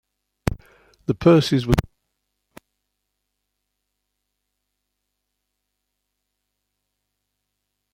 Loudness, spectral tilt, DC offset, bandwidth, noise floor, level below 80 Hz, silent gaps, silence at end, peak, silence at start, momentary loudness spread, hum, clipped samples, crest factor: -20 LUFS; -7 dB/octave; under 0.1%; 16 kHz; -78 dBFS; -42 dBFS; none; 6.15 s; -2 dBFS; 0.45 s; 15 LU; 50 Hz at -60 dBFS; under 0.1%; 24 dB